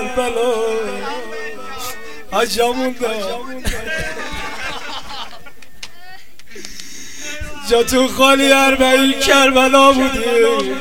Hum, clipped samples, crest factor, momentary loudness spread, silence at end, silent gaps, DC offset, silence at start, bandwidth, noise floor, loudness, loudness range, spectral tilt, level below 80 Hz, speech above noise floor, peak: none; under 0.1%; 18 dB; 21 LU; 0 s; none; 4%; 0 s; 17 kHz; -41 dBFS; -15 LUFS; 16 LU; -2.5 dB/octave; -38 dBFS; 27 dB; 0 dBFS